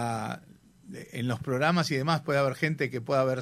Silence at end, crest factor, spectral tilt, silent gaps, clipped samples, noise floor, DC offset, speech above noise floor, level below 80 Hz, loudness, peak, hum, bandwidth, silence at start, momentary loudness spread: 0 s; 18 dB; -6 dB/octave; none; under 0.1%; -55 dBFS; under 0.1%; 28 dB; -64 dBFS; -28 LUFS; -10 dBFS; none; 15.5 kHz; 0 s; 15 LU